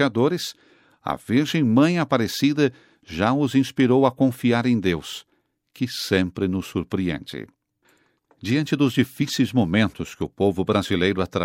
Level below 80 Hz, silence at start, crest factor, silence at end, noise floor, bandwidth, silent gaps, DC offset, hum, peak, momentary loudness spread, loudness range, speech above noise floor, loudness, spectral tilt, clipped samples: -56 dBFS; 0 s; 18 dB; 0 s; -63 dBFS; 16.5 kHz; none; under 0.1%; none; -4 dBFS; 12 LU; 6 LU; 42 dB; -22 LUFS; -6 dB/octave; under 0.1%